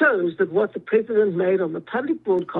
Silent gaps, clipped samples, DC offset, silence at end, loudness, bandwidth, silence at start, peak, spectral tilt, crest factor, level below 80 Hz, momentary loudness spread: none; under 0.1%; under 0.1%; 0 s; -22 LUFS; 4.1 kHz; 0 s; -6 dBFS; -9.5 dB/octave; 16 dB; -70 dBFS; 6 LU